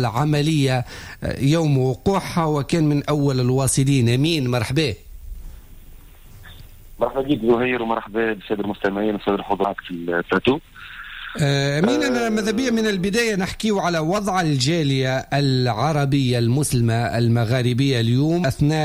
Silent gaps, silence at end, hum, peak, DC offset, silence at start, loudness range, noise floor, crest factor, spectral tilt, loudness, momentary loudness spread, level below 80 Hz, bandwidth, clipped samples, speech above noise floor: none; 0 s; none; -8 dBFS; under 0.1%; 0 s; 5 LU; -42 dBFS; 14 dB; -5.5 dB/octave; -20 LUFS; 6 LU; -42 dBFS; 16 kHz; under 0.1%; 23 dB